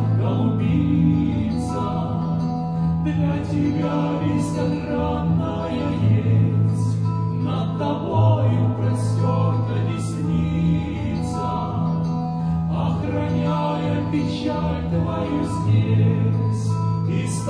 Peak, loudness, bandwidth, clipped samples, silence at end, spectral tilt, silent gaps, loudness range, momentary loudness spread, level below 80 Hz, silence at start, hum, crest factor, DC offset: -6 dBFS; -22 LUFS; 10.5 kHz; under 0.1%; 0 s; -8 dB/octave; none; 2 LU; 6 LU; -40 dBFS; 0 s; none; 14 dB; under 0.1%